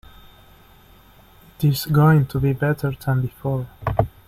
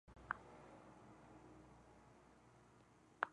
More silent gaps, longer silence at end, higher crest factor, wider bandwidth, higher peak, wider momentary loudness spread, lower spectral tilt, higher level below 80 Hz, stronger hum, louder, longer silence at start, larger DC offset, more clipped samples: neither; first, 0.2 s vs 0 s; second, 18 dB vs 36 dB; first, 16 kHz vs 10.5 kHz; first, -4 dBFS vs -18 dBFS; second, 10 LU vs 18 LU; first, -7.5 dB/octave vs -5 dB/octave; first, -42 dBFS vs -74 dBFS; neither; first, -20 LUFS vs -55 LUFS; first, 1.6 s vs 0.05 s; neither; neither